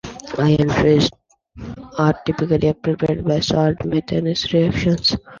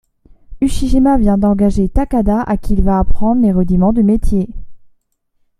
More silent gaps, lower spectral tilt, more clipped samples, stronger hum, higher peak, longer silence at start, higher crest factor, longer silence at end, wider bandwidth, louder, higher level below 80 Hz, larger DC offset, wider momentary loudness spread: neither; second, -6.5 dB/octave vs -8.5 dB/octave; neither; neither; about the same, -2 dBFS vs -2 dBFS; second, 0.05 s vs 0.5 s; about the same, 16 dB vs 12 dB; second, 0 s vs 0.85 s; second, 7.4 kHz vs 12 kHz; second, -18 LUFS vs -14 LUFS; second, -40 dBFS vs -22 dBFS; neither; about the same, 8 LU vs 6 LU